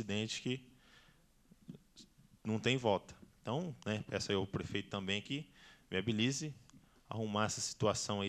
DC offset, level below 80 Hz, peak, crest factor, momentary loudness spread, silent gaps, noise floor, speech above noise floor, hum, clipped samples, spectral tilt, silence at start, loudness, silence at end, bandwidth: under 0.1%; -68 dBFS; -16 dBFS; 22 dB; 19 LU; none; -68 dBFS; 30 dB; none; under 0.1%; -4.5 dB/octave; 0 s; -38 LUFS; 0 s; 14.5 kHz